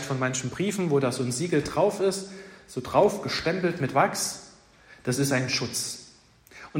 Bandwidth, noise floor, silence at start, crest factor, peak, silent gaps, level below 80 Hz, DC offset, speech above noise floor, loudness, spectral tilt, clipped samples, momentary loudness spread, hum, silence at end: 16 kHz; -54 dBFS; 0 s; 20 dB; -6 dBFS; none; -58 dBFS; under 0.1%; 29 dB; -26 LUFS; -4.5 dB/octave; under 0.1%; 14 LU; none; 0 s